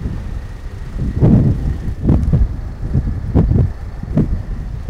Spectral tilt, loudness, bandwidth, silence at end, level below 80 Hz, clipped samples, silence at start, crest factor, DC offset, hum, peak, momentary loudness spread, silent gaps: -10 dB/octave; -17 LUFS; 7.4 kHz; 0 s; -20 dBFS; under 0.1%; 0 s; 16 dB; under 0.1%; none; 0 dBFS; 16 LU; none